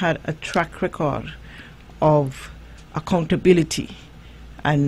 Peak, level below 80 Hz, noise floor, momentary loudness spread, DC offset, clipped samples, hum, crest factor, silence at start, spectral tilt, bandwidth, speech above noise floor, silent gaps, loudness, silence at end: -2 dBFS; -42 dBFS; -41 dBFS; 24 LU; under 0.1%; under 0.1%; none; 20 dB; 0 s; -6 dB/octave; 13 kHz; 21 dB; none; -22 LUFS; 0 s